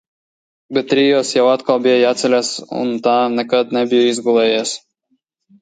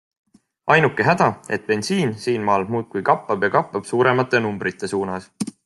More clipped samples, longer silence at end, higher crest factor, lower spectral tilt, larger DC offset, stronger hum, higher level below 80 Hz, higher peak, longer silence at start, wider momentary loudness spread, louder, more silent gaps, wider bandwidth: neither; first, 0.85 s vs 0.15 s; about the same, 14 dB vs 18 dB; second, -3.5 dB/octave vs -5.5 dB/octave; neither; neither; second, -68 dBFS vs -62 dBFS; about the same, -2 dBFS vs -2 dBFS; about the same, 0.7 s vs 0.65 s; about the same, 8 LU vs 9 LU; first, -15 LUFS vs -20 LUFS; neither; second, 9.6 kHz vs 12 kHz